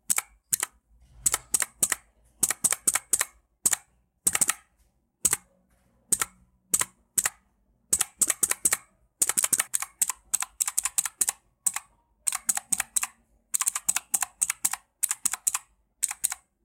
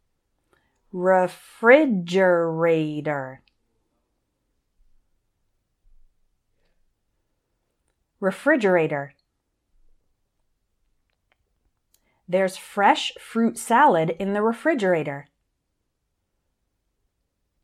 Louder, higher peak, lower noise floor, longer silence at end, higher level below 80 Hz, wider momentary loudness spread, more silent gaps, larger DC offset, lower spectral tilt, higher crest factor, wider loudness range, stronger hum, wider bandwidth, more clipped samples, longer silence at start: second, -26 LUFS vs -21 LUFS; second, -6 dBFS vs -2 dBFS; second, -68 dBFS vs -76 dBFS; second, 0.3 s vs 2.4 s; about the same, -62 dBFS vs -66 dBFS; second, 7 LU vs 12 LU; neither; neither; second, 1 dB/octave vs -5.5 dB/octave; about the same, 24 dB vs 24 dB; second, 3 LU vs 12 LU; neither; first, 17 kHz vs 14 kHz; neither; second, 0.1 s vs 0.95 s